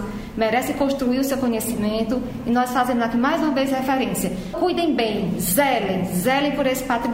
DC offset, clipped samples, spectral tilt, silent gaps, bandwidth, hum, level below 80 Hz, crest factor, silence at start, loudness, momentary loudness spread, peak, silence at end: under 0.1%; under 0.1%; -4.5 dB/octave; none; 16.5 kHz; none; -44 dBFS; 16 dB; 0 s; -21 LUFS; 4 LU; -6 dBFS; 0 s